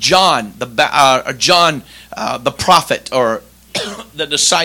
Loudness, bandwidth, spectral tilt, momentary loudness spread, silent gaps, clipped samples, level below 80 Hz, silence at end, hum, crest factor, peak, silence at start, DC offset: -13 LUFS; over 20 kHz; -2 dB/octave; 14 LU; none; 0.6%; -48 dBFS; 0 s; none; 14 dB; 0 dBFS; 0 s; under 0.1%